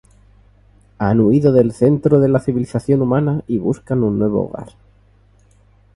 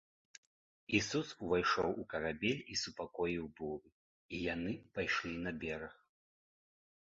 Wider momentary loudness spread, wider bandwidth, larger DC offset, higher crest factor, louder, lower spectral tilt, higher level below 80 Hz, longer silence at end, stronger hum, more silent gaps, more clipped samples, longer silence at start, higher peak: second, 8 LU vs 11 LU; first, 11.5 kHz vs 7.6 kHz; neither; second, 16 dB vs 22 dB; first, -16 LUFS vs -38 LUFS; first, -9.5 dB/octave vs -3 dB/octave; first, -46 dBFS vs -64 dBFS; first, 1.25 s vs 1.1 s; first, 50 Hz at -40 dBFS vs none; second, none vs 3.92-4.29 s; neither; about the same, 1 s vs 0.9 s; first, 0 dBFS vs -18 dBFS